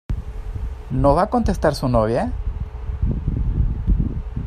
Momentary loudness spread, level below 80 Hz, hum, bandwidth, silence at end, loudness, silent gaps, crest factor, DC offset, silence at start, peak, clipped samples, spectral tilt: 13 LU; -24 dBFS; none; 13.5 kHz; 0 s; -22 LUFS; none; 18 dB; under 0.1%; 0.1 s; -2 dBFS; under 0.1%; -8 dB/octave